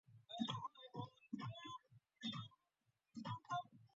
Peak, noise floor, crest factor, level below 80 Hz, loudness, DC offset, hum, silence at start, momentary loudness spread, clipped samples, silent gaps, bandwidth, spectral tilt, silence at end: -30 dBFS; -87 dBFS; 20 dB; -84 dBFS; -50 LUFS; under 0.1%; none; 0.1 s; 10 LU; under 0.1%; none; 7.6 kHz; -4 dB/octave; 0.1 s